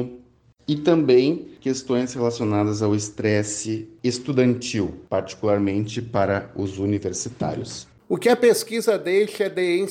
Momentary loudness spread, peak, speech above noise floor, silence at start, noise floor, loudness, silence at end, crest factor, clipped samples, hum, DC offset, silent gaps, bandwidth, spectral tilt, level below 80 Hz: 10 LU; -6 dBFS; 32 dB; 0 s; -53 dBFS; -22 LUFS; 0 s; 16 dB; under 0.1%; none; under 0.1%; none; 16 kHz; -5.5 dB/octave; -58 dBFS